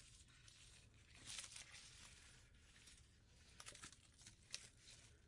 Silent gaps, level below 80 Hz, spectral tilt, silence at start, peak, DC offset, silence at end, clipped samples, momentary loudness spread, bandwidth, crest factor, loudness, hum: none; -74 dBFS; -1 dB/octave; 0 s; -28 dBFS; under 0.1%; 0 s; under 0.1%; 14 LU; 12 kHz; 34 dB; -59 LUFS; none